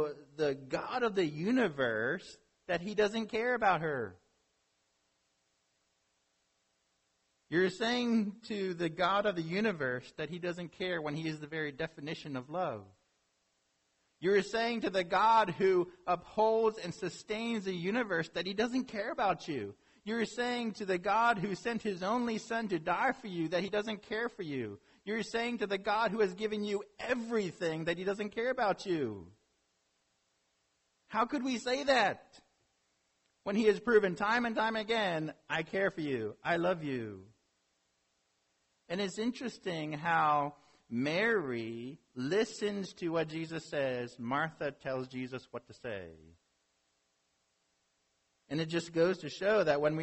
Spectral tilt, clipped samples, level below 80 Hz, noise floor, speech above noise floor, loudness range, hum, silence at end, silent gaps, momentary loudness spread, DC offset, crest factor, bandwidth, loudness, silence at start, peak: -5.5 dB/octave; under 0.1%; -70 dBFS; -78 dBFS; 45 dB; 7 LU; none; 0 s; none; 11 LU; under 0.1%; 20 dB; 8.2 kHz; -34 LUFS; 0 s; -14 dBFS